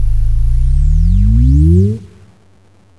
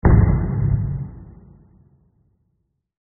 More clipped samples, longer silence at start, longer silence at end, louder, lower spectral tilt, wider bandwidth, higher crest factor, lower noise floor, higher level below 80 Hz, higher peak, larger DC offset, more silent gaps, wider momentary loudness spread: neither; about the same, 0 s vs 0.05 s; second, 0.95 s vs 1.75 s; first, -12 LUFS vs -20 LUFS; first, -10.5 dB/octave vs -8.5 dB/octave; second, 1.8 kHz vs 2.3 kHz; second, 8 dB vs 18 dB; second, -48 dBFS vs -71 dBFS; first, -12 dBFS vs -26 dBFS; about the same, -2 dBFS vs -4 dBFS; neither; neither; second, 7 LU vs 19 LU